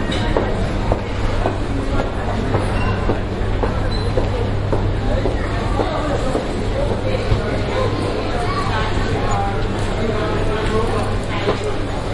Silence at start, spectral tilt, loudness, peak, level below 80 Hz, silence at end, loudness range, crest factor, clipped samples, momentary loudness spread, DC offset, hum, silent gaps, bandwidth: 0 s; -6.5 dB/octave; -20 LUFS; -2 dBFS; -24 dBFS; 0 s; 1 LU; 16 dB; under 0.1%; 2 LU; under 0.1%; none; none; 11.5 kHz